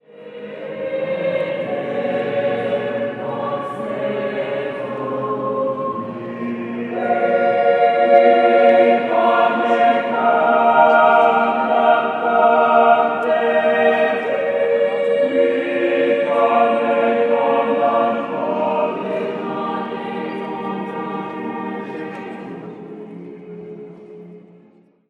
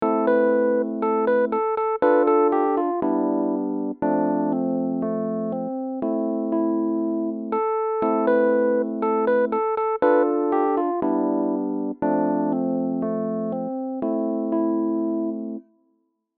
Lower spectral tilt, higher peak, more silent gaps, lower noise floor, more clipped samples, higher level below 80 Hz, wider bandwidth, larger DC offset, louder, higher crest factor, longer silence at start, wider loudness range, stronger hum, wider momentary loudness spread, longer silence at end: second, -7 dB/octave vs -11.5 dB/octave; first, 0 dBFS vs -8 dBFS; neither; second, -52 dBFS vs -69 dBFS; neither; about the same, -72 dBFS vs -68 dBFS; first, 8.4 kHz vs 4.2 kHz; neither; first, -17 LUFS vs -23 LUFS; about the same, 18 dB vs 14 dB; first, 0.15 s vs 0 s; first, 13 LU vs 4 LU; neither; first, 17 LU vs 8 LU; about the same, 0.7 s vs 0.8 s